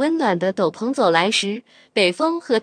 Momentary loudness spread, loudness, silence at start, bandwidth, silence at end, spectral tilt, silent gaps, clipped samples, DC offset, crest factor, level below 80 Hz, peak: 8 LU; -19 LUFS; 0 s; 10.5 kHz; 0 s; -4 dB/octave; none; under 0.1%; under 0.1%; 20 dB; -72 dBFS; 0 dBFS